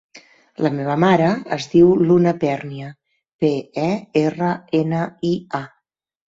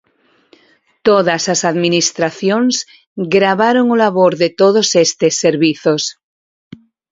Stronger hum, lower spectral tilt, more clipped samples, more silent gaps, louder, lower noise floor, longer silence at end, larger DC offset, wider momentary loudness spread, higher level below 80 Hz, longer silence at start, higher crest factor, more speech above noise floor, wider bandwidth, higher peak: neither; first, -7.5 dB/octave vs -3.5 dB/octave; neither; about the same, 3.34-3.39 s vs 3.07-3.16 s; second, -19 LUFS vs -13 LUFS; first, -72 dBFS vs -57 dBFS; second, 0.6 s vs 1 s; neither; first, 14 LU vs 6 LU; about the same, -56 dBFS vs -58 dBFS; second, 0.15 s vs 1.05 s; about the same, 16 dB vs 14 dB; first, 54 dB vs 44 dB; about the same, 7.6 kHz vs 7.8 kHz; about the same, -2 dBFS vs 0 dBFS